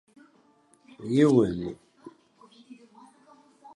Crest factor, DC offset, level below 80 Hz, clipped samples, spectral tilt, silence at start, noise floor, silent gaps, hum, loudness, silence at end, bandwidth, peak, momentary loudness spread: 22 dB; under 0.1%; -60 dBFS; under 0.1%; -7.5 dB/octave; 1 s; -62 dBFS; none; none; -24 LUFS; 0.1 s; 11 kHz; -8 dBFS; 22 LU